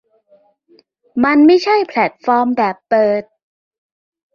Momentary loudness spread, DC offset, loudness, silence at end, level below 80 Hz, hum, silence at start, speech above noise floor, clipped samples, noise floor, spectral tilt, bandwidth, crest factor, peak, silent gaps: 8 LU; under 0.1%; -14 LUFS; 1.15 s; -60 dBFS; none; 1.15 s; 41 dB; under 0.1%; -54 dBFS; -6 dB/octave; 7 kHz; 14 dB; -2 dBFS; none